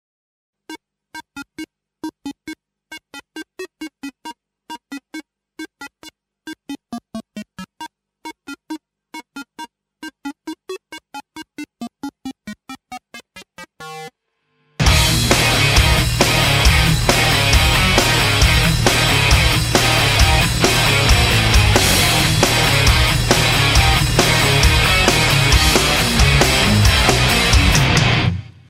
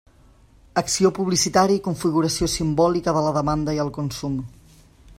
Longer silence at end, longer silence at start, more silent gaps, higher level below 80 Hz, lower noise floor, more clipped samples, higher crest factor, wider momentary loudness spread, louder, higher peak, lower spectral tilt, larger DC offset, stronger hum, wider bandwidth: second, 0.25 s vs 0.7 s; about the same, 0.7 s vs 0.75 s; neither; first, -24 dBFS vs -44 dBFS; first, -68 dBFS vs -52 dBFS; neither; about the same, 16 dB vs 18 dB; first, 23 LU vs 9 LU; first, -13 LUFS vs -21 LUFS; first, 0 dBFS vs -4 dBFS; about the same, -3.5 dB/octave vs -4.5 dB/octave; neither; neither; about the same, 16.5 kHz vs 16 kHz